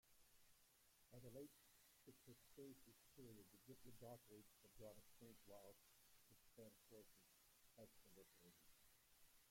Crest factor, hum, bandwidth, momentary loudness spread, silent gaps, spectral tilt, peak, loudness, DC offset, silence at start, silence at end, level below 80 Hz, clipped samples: 18 dB; none; 16.5 kHz; 6 LU; none; -4.5 dB/octave; -48 dBFS; -66 LUFS; under 0.1%; 0.05 s; 0 s; -84 dBFS; under 0.1%